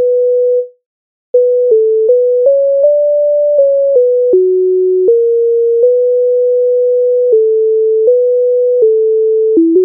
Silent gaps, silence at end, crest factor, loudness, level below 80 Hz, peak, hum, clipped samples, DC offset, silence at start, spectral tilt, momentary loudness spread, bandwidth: 0.86-1.34 s; 0 s; 8 dB; -10 LUFS; -72 dBFS; 0 dBFS; none; under 0.1%; under 0.1%; 0 s; -9.5 dB/octave; 1 LU; 0.9 kHz